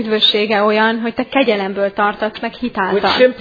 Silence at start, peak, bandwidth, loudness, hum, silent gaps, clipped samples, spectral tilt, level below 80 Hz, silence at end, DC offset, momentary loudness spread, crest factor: 0 s; 0 dBFS; 5 kHz; -15 LUFS; none; none; under 0.1%; -6 dB/octave; -52 dBFS; 0 s; under 0.1%; 9 LU; 16 dB